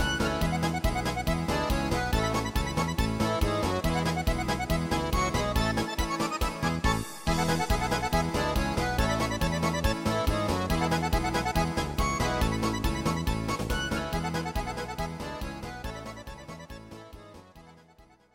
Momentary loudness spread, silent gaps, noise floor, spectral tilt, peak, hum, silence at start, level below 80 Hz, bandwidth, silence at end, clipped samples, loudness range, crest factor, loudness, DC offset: 10 LU; none; -58 dBFS; -5 dB/octave; -12 dBFS; none; 0 s; -36 dBFS; 17 kHz; 0.35 s; under 0.1%; 7 LU; 16 dB; -29 LUFS; under 0.1%